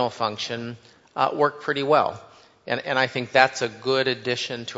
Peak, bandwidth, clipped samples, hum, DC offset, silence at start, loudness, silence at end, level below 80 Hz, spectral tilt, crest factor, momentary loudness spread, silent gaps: 0 dBFS; 8 kHz; under 0.1%; none; under 0.1%; 0 s; -23 LUFS; 0 s; -70 dBFS; -4 dB/octave; 24 dB; 13 LU; none